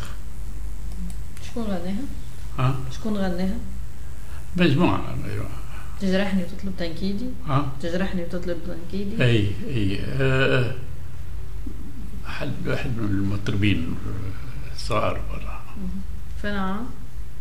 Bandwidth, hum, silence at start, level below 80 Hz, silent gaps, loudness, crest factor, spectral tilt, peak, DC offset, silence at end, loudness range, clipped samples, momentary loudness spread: 16 kHz; none; 0 s; -36 dBFS; none; -27 LUFS; 20 dB; -6.5 dB/octave; -6 dBFS; 7%; 0 s; 4 LU; under 0.1%; 16 LU